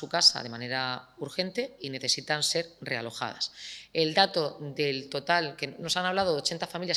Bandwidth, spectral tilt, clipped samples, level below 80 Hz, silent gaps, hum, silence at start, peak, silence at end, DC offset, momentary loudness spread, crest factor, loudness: 19 kHz; -2.5 dB/octave; under 0.1%; -70 dBFS; none; none; 0 s; -8 dBFS; 0 s; under 0.1%; 11 LU; 22 dB; -28 LUFS